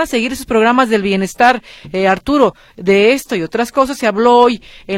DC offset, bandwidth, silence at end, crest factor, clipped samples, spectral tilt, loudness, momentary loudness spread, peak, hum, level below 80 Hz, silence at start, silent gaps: under 0.1%; 16.5 kHz; 0 s; 14 dB; under 0.1%; -5 dB/octave; -13 LUFS; 8 LU; 0 dBFS; none; -44 dBFS; 0 s; none